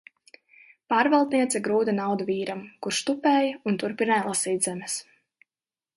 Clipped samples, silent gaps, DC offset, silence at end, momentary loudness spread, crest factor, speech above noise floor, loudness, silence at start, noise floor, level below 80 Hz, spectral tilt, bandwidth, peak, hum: under 0.1%; none; under 0.1%; 0.95 s; 10 LU; 18 dB; over 65 dB; -25 LUFS; 0.9 s; under -90 dBFS; -74 dBFS; -3.5 dB/octave; 12 kHz; -8 dBFS; none